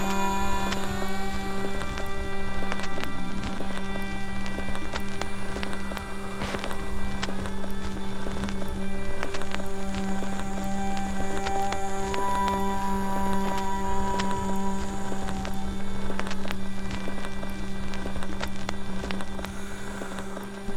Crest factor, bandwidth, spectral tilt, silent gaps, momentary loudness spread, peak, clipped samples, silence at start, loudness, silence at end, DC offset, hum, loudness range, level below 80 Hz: 16 dB; 13 kHz; -5 dB/octave; none; 7 LU; -8 dBFS; under 0.1%; 0 s; -32 LUFS; 0 s; under 0.1%; none; 5 LU; -36 dBFS